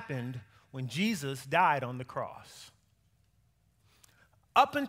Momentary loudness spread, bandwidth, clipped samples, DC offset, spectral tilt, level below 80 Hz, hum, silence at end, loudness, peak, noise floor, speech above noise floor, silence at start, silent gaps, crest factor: 21 LU; 16 kHz; under 0.1%; under 0.1%; -5 dB/octave; -72 dBFS; none; 0 s; -31 LUFS; -10 dBFS; -70 dBFS; 38 dB; 0 s; none; 24 dB